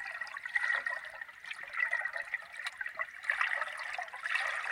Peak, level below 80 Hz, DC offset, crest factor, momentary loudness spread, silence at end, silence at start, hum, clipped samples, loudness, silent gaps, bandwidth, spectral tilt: -16 dBFS; -80 dBFS; under 0.1%; 22 dB; 9 LU; 0 s; 0 s; none; under 0.1%; -35 LUFS; none; 16.5 kHz; 1 dB/octave